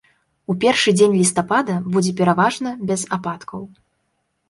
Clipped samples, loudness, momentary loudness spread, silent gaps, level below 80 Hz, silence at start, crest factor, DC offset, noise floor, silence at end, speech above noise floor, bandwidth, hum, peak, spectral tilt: under 0.1%; -18 LUFS; 16 LU; none; -60 dBFS; 0.5 s; 18 dB; under 0.1%; -70 dBFS; 0.8 s; 52 dB; 11.5 kHz; none; -2 dBFS; -4.5 dB/octave